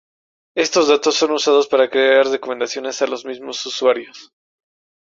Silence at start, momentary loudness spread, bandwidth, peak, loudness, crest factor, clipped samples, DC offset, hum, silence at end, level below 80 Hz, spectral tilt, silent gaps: 0.55 s; 12 LU; 7.6 kHz; -2 dBFS; -17 LUFS; 16 dB; under 0.1%; under 0.1%; none; 0.8 s; -66 dBFS; -1.5 dB/octave; none